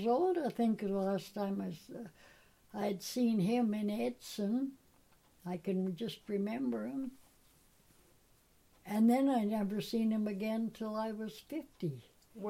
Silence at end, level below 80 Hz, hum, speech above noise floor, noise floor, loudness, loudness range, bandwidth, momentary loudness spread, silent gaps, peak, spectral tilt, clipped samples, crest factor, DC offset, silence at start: 0 s; -72 dBFS; none; 33 dB; -68 dBFS; -36 LUFS; 6 LU; 16 kHz; 13 LU; none; -20 dBFS; -6.5 dB/octave; under 0.1%; 16 dB; under 0.1%; 0 s